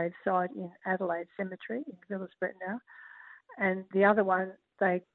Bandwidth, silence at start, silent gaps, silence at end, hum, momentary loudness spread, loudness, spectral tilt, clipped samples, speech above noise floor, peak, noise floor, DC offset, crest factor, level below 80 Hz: 4.2 kHz; 0 s; none; 0.15 s; none; 19 LU; -32 LUFS; -10.5 dB/octave; under 0.1%; 21 dB; -12 dBFS; -52 dBFS; under 0.1%; 20 dB; -76 dBFS